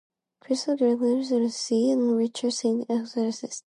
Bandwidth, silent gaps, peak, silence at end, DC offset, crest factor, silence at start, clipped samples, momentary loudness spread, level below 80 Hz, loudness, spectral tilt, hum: 11 kHz; none; -12 dBFS; 0.05 s; under 0.1%; 14 dB; 0.5 s; under 0.1%; 6 LU; -80 dBFS; -25 LUFS; -4.5 dB/octave; none